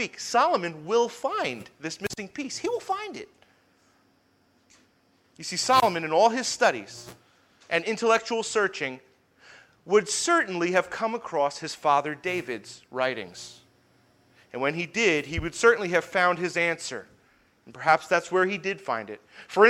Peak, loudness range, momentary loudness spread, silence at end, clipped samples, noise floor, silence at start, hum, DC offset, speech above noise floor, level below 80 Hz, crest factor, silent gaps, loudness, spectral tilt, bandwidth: -4 dBFS; 8 LU; 15 LU; 0 s; under 0.1%; -65 dBFS; 0 s; none; under 0.1%; 39 dB; -58 dBFS; 22 dB; none; -26 LUFS; -3 dB/octave; 16.5 kHz